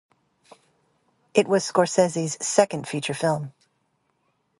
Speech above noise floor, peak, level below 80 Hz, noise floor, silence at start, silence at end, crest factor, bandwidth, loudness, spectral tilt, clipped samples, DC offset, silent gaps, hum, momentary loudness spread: 48 dB; -2 dBFS; -70 dBFS; -71 dBFS; 1.35 s; 1.1 s; 24 dB; 11.5 kHz; -23 LUFS; -4.5 dB/octave; under 0.1%; under 0.1%; none; none; 8 LU